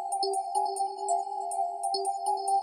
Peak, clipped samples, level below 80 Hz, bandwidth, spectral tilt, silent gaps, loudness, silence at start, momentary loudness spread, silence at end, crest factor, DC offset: -16 dBFS; under 0.1%; -88 dBFS; 11.5 kHz; 0 dB/octave; none; -30 LUFS; 0 s; 3 LU; 0 s; 12 dB; under 0.1%